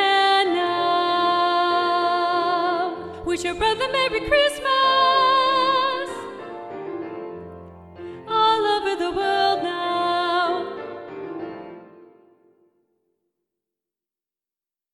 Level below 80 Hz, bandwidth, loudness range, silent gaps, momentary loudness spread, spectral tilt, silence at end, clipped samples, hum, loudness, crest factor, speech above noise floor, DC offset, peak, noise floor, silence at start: -52 dBFS; 13 kHz; 10 LU; none; 18 LU; -3.5 dB/octave; 2.9 s; under 0.1%; none; -20 LUFS; 16 dB; over 69 dB; under 0.1%; -6 dBFS; under -90 dBFS; 0 s